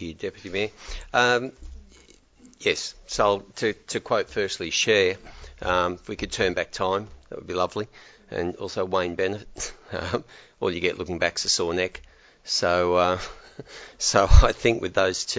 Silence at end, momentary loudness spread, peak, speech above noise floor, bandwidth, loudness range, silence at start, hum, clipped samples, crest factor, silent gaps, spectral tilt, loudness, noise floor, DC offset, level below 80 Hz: 0 s; 14 LU; -2 dBFS; 30 dB; 8 kHz; 6 LU; 0 s; none; under 0.1%; 24 dB; none; -3.5 dB/octave; -25 LUFS; -54 dBFS; under 0.1%; -32 dBFS